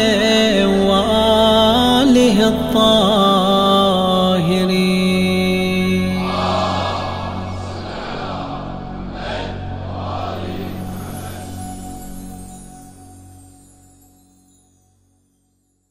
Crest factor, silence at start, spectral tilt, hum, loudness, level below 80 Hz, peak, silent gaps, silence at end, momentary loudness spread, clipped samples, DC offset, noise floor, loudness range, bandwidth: 16 dB; 0 s; -5.5 dB/octave; none; -16 LUFS; -38 dBFS; -2 dBFS; none; 2.6 s; 18 LU; under 0.1%; under 0.1%; -64 dBFS; 19 LU; 16 kHz